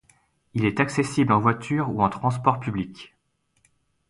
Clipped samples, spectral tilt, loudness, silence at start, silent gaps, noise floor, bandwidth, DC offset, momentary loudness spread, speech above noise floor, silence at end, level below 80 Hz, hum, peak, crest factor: under 0.1%; -6.5 dB/octave; -23 LUFS; 0.55 s; none; -70 dBFS; 11.5 kHz; under 0.1%; 12 LU; 47 dB; 1.05 s; -54 dBFS; none; -4 dBFS; 20 dB